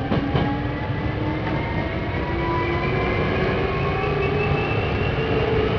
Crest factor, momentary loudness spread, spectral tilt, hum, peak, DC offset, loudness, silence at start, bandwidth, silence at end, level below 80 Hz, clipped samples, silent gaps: 16 dB; 4 LU; -8.5 dB/octave; none; -6 dBFS; under 0.1%; -23 LUFS; 0 s; 5.4 kHz; 0 s; -32 dBFS; under 0.1%; none